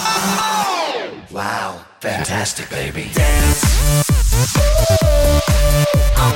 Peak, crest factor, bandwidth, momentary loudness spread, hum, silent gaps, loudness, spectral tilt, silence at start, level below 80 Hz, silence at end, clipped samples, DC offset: -4 dBFS; 12 dB; 17 kHz; 10 LU; none; none; -16 LUFS; -4 dB/octave; 0 s; -18 dBFS; 0 s; under 0.1%; under 0.1%